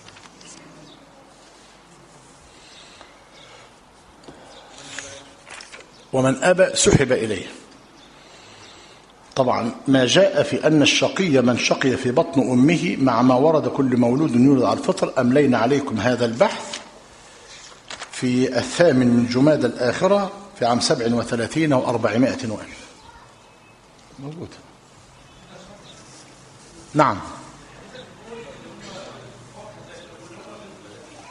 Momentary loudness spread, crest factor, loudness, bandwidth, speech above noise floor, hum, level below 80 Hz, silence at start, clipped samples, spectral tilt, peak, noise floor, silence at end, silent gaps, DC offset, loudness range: 25 LU; 22 dB; -19 LUFS; 11 kHz; 31 dB; none; -52 dBFS; 0.45 s; under 0.1%; -5 dB/octave; 0 dBFS; -49 dBFS; 0 s; none; under 0.1%; 22 LU